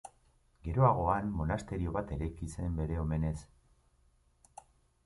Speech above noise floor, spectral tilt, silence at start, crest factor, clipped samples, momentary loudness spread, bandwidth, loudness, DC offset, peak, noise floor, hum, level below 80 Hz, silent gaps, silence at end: 37 dB; -8.5 dB/octave; 0.05 s; 22 dB; under 0.1%; 12 LU; 11.5 kHz; -34 LUFS; under 0.1%; -14 dBFS; -69 dBFS; none; -44 dBFS; none; 1.6 s